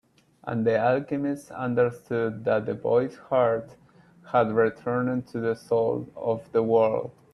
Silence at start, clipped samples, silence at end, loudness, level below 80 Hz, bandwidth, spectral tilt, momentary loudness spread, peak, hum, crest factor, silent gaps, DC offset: 0.45 s; under 0.1%; 0.25 s; -26 LUFS; -66 dBFS; 12 kHz; -8 dB/octave; 7 LU; -8 dBFS; none; 16 dB; none; under 0.1%